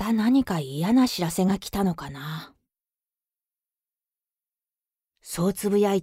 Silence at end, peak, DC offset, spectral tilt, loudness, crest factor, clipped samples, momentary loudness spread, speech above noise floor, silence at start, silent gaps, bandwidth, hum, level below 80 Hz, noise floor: 0 s; -10 dBFS; under 0.1%; -6 dB/octave; -24 LUFS; 16 dB; under 0.1%; 14 LU; over 66 dB; 0 s; none; 16 kHz; none; -54 dBFS; under -90 dBFS